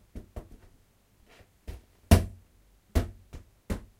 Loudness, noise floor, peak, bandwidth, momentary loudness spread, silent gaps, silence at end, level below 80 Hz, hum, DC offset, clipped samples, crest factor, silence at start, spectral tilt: -29 LUFS; -63 dBFS; -4 dBFS; 16 kHz; 26 LU; none; 0.2 s; -36 dBFS; none; under 0.1%; under 0.1%; 28 dB; 0.15 s; -6 dB/octave